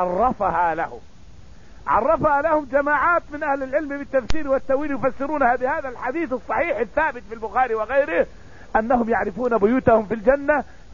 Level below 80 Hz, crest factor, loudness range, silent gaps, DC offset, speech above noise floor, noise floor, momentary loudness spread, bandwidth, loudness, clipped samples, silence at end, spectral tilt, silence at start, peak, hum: -42 dBFS; 16 dB; 3 LU; none; 0.8%; 25 dB; -46 dBFS; 7 LU; 7.4 kHz; -21 LUFS; under 0.1%; 0.3 s; -7 dB/octave; 0 s; -4 dBFS; none